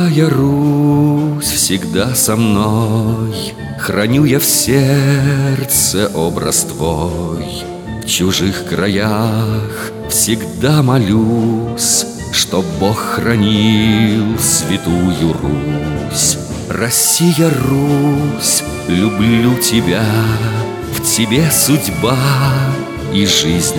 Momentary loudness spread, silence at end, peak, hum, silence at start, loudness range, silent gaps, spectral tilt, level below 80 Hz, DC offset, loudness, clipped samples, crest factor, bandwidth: 7 LU; 0 s; 0 dBFS; none; 0 s; 2 LU; none; -4.5 dB/octave; -36 dBFS; under 0.1%; -13 LUFS; under 0.1%; 14 dB; over 20 kHz